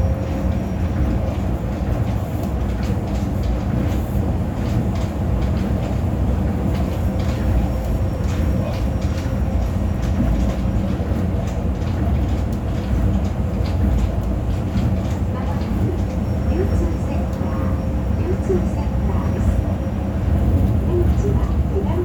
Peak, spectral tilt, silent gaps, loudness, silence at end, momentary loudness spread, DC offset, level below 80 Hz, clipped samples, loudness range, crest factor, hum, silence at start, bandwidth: -6 dBFS; -8.5 dB/octave; none; -21 LUFS; 0 s; 3 LU; under 0.1%; -24 dBFS; under 0.1%; 2 LU; 14 dB; none; 0 s; 19 kHz